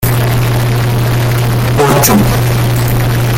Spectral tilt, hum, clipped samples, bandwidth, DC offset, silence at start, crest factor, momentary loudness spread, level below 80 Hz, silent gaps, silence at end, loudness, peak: -5.5 dB/octave; none; under 0.1%; 17 kHz; under 0.1%; 0 s; 10 dB; 4 LU; -24 dBFS; none; 0 s; -11 LUFS; 0 dBFS